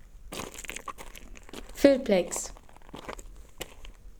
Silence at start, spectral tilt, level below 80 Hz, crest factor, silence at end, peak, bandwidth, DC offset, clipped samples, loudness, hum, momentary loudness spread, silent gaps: 0.05 s; -4 dB/octave; -48 dBFS; 26 dB; 0 s; -6 dBFS; over 20 kHz; under 0.1%; under 0.1%; -28 LUFS; none; 23 LU; none